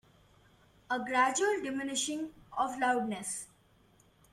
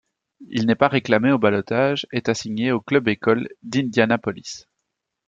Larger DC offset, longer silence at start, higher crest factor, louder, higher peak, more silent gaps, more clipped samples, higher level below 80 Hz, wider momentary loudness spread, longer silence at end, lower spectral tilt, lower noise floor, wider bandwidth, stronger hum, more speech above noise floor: neither; first, 0.9 s vs 0.4 s; about the same, 18 dB vs 20 dB; second, -32 LUFS vs -21 LUFS; second, -16 dBFS vs -2 dBFS; neither; neither; second, -70 dBFS vs -62 dBFS; about the same, 12 LU vs 10 LU; first, 0.85 s vs 0.7 s; second, -2 dB/octave vs -5.5 dB/octave; second, -65 dBFS vs -79 dBFS; first, 15 kHz vs 7.8 kHz; neither; second, 33 dB vs 59 dB